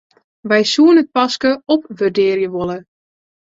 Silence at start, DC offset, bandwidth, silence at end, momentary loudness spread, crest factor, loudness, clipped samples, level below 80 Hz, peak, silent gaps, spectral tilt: 0.45 s; under 0.1%; 7.8 kHz; 0.65 s; 13 LU; 14 dB; -15 LUFS; under 0.1%; -58 dBFS; -2 dBFS; none; -4.5 dB/octave